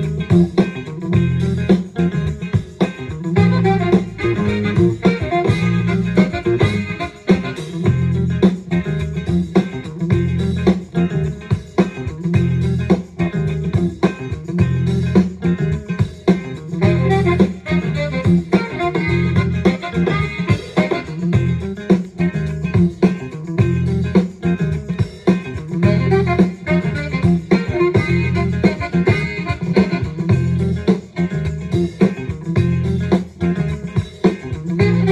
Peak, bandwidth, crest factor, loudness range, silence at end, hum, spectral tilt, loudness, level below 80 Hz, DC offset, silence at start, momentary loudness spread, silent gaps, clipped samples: 0 dBFS; 9.6 kHz; 16 dB; 2 LU; 0 s; none; -8 dB/octave; -18 LUFS; -38 dBFS; under 0.1%; 0 s; 6 LU; none; under 0.1%